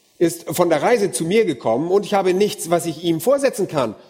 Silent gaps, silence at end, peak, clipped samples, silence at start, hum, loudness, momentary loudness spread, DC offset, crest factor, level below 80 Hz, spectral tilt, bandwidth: none; 0.15 s; -2 dBFS; under 0.1%; 0.2 s; none; -19 LUFS; 4 LU; under 0.1%; 18 dB; -62 dBFS; -5 dB/octave; 16.5 kHz